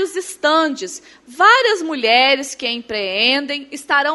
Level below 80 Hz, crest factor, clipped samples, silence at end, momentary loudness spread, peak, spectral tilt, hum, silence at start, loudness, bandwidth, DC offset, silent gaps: -64 dBFS; 16 dB; under 0.1%; 0 s; 14 LU; 0 dBFS; -1 dB/octave; none; 0 s; -15 LUFS; 12 kHz; under 0.1%; none